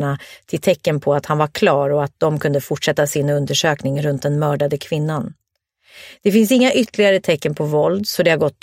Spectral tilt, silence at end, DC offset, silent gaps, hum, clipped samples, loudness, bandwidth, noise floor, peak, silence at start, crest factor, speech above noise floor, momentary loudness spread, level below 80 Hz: -5.5 dB/octave; 0.1 s; under 0.1%; none; none; under 0.1%; -18 LUFS; 16.5 kHz; -60 dBFS; 0 dBFS; 0 s; 18 dB; 42 dB; 7 LU; -56 dBFS